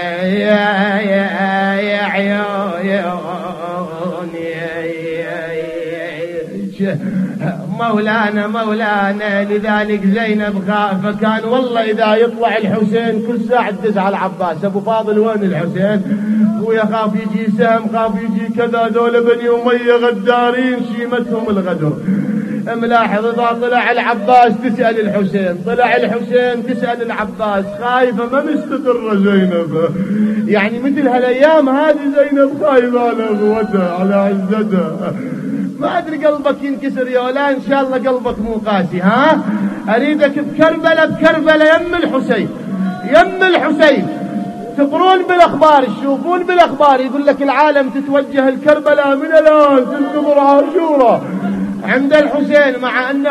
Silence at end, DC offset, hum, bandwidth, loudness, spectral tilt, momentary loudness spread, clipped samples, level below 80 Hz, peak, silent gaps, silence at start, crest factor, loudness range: 0 s; under 0.1%; none; 12 kHz; -14 LUFS; -7 dB/octave; 9 LU; under 0.1%; -50 dBFS; 0 dBFS; none; 0 s; 14 dB; 5 LU